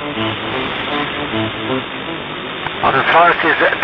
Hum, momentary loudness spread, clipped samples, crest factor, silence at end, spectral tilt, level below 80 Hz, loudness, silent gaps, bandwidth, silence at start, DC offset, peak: none; 13 LU; under 0.1%; 16 dB; 0 s; -7 dB/octave; -46 dBFS; -16 LUFS; none; 6.4 kHz; 0 s; under 0.1%; 0 dBFS